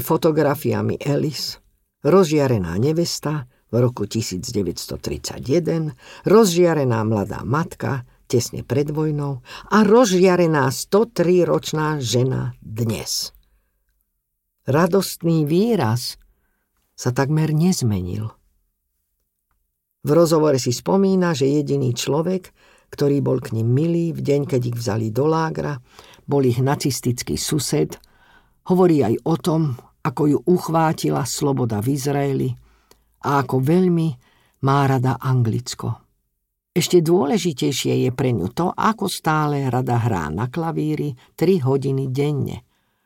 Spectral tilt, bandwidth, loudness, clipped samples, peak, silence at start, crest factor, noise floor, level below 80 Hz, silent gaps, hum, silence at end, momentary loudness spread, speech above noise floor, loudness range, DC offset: -6 dB/octave; 17 kHz; -20 LUFS; under 0.1%; -2 dBFS; 0 s; 18 dB; -75 dBFS; -50 dBFS; none; none; 0.45 s; 11 LU; 56 dB; 4 LU; under 0.1%